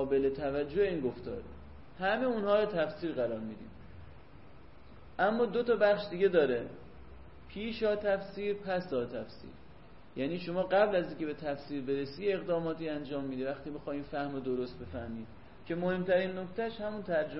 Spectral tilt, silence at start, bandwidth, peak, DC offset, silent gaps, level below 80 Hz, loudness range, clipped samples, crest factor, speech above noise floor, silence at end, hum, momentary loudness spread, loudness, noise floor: -9.5 dB/octave; 0 s; 5.8 kHz; -14 dBFS; 0.3%; none; -58 dBFS; 5 LU; under 0.1%; 18 dB; 23 dB; 0 s; none; 19 LU; -33 LUFS; -55 dBFS